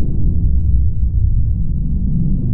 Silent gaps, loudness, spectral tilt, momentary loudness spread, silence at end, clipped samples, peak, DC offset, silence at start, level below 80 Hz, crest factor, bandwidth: none; -18 LUFS; -16.5 dB/octave; 3 LU; 0 s; under 0.1%; -2 dBFS; under 0.1%; 0 s; -16 dBFS; 10 dB; 0.9 kHz